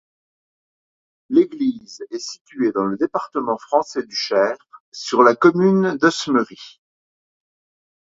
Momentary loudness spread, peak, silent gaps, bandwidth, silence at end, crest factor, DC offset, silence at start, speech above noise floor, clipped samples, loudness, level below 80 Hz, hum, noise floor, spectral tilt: 17 LU; 0 dBFS; 2.41-2.45 s, 4.80-4.92 s; 7.8 kHz; 1.5 s; 20 dB; under 0.1%; 1.3 s; over 71 dB; under 0.1%; -19 LUFS; -66 dBFS; none; under -90 dBFS; -5.5 dB/octave